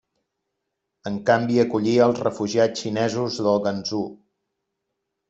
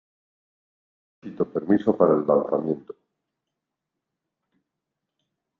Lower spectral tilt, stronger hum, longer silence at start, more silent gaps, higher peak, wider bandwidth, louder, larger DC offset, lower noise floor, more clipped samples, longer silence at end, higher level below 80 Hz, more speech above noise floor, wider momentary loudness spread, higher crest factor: second, -5.5 dB/octave vs -10.5 dB/octave; neither; second, 1.05 s vs 1.25 s; neither; about the same, -4 dBFS vs -6 dBFS; first, 8 kHz vs 4.4 kHz; about the same, -22 LUFS vs -23 LUFS; neither; second, -80 dBFS vs -84 dBFS; neither; second, 1.15 s vs 2.7 s; first, -64 dBFS vs -70 dBFS; second, 58 dB vs 62 dB; about the same, 10 LU vs 11 LU; about the same, 20 dB vs 22 dB